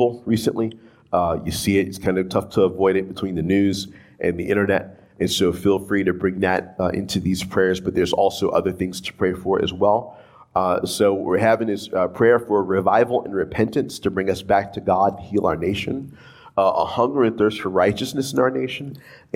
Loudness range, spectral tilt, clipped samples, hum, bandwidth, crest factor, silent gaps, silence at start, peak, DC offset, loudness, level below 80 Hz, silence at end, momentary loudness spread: 2 LU; -5.5 dB/octave; under 0.1%; none; 16.5 kHz; 16 dB; none; 0 s; -4 dBFS; under 0.1%; -21 LUFS; -52 dBFS; 0.2 s; 8 LU